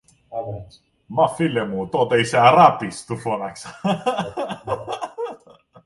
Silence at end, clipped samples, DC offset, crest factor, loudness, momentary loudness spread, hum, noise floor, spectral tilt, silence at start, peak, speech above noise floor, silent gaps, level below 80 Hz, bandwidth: 0.5 s; under 0.1%; under 0.1%; 20 dB; -20 LUFS; 17 LU; none; -50 dBFS; -5.5 dB/octave; 0.3 s; 0 dBFS; 30 dB; none; -56 dBFS; 11.5 kHz